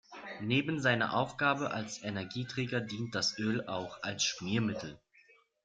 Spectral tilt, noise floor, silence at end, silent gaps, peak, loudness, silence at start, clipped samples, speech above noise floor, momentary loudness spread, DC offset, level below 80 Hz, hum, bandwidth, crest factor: -4 dB/octave; -65 dBFS; 0.7 s; none; -14 dBFS; -33 LUFS; 0.1 s; under 0.1%; 31 dB; 9 LU; under 0.1%; -70 dBFS; none; 9.4 kHz; 20 dB